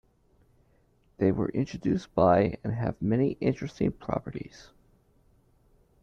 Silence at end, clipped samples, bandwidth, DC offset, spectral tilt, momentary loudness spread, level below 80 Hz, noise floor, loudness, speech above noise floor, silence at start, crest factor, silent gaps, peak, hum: 1.4 s; under 0.1%; 7.6 kHz; under 0.1%; -8.5 dB/octave; 11 LU; -54 dBFS; -65 dBFS; -28 LUFS; 38 dB; 1.2 s; 20 dB; none; -10 dBFS; none